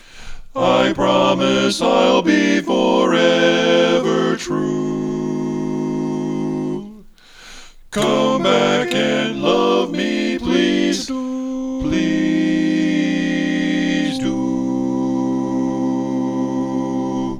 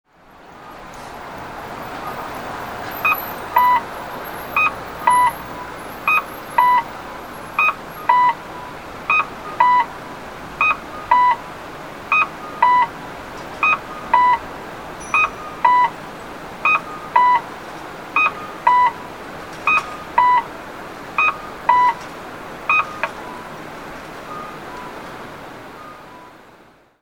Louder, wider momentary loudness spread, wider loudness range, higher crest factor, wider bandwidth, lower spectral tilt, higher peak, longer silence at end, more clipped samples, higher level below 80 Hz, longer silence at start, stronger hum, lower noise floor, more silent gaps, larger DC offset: about the same, -18 LUFS vs -18 LUFS; second, 8 LU vs 18 LU; about the same, 6 LU vs 6 LU; about the same, 18 dB vs 20 dB; second, 13 kHz vs over 20 kHz; first, -5 dB/octave vs -3.5 dB/octave; about the same, 0 dBFS vs 0 dBFS; second, 0 s vs 0.5 s; neither; first, -44 dBFS vs -50 dBFS; second, 0.15 s vs 0.3 s; neither; second, -42 dBFS vs -49 dBFS; neither; second, under 0.1% vs 0.2%